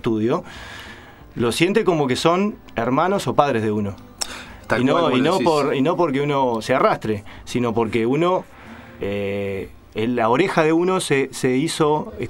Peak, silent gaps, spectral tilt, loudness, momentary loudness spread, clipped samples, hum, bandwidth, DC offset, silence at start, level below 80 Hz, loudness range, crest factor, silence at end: 0 dBFS; none; -5.5 dB/octave; -20 LUFS; 13 LU; under 0.1%; none; 16 kHz; under 0.1%; 0.05 s; -50 dBFS; 3 LU; 20 dB; 0 s